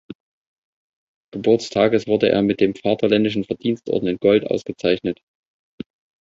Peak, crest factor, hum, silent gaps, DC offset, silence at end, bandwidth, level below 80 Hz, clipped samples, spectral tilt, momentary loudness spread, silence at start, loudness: -2 dBFS; 18 dB; none; 0.15-1.32 s; under 0.1%; 1.05 s; 7.8 kHz; -56 dBFS; under 0.1%; -6.5 dB/octave; 18 LU; 0.1 s; -19 LUFS